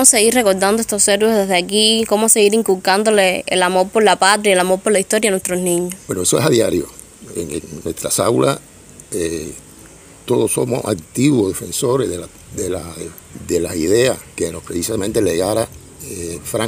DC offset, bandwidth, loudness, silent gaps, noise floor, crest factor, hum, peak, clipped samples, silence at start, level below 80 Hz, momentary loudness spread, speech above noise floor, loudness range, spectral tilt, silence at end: under 0.1%; 16 kHz; -16 LUFS; none; -41 dBFS; 16 dB; none; 0 dBFS; under 0.1%; 0 s; -48 dBFS; 15 LU; 25 dB; 7 LU; -3 dB/octave; 0 s